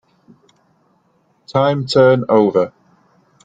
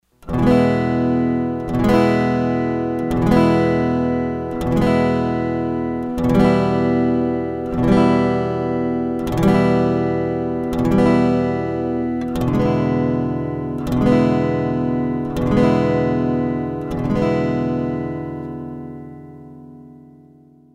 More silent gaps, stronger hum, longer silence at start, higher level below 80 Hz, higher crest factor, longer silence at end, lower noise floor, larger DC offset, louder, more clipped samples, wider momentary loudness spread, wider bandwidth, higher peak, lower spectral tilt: neither; neither; first, 1.5 s vs 0.25 s; second, -60 dBFS vs -36 dBFS; about the same, 16 dB vs 16 dB; about the same, 0.75 s vs 0.8 s; first, -60 dBFS vs -48 dBFS; neither; first, -15 LUFS vs -18 LUFS; neither; about the same, 9 LU vs 9 LU; second, 9 kHz vs 14 kHz; about the same, -2 dBFS vs -2 dBFS; second, -7 dB/octave vs -8.5 dB/octave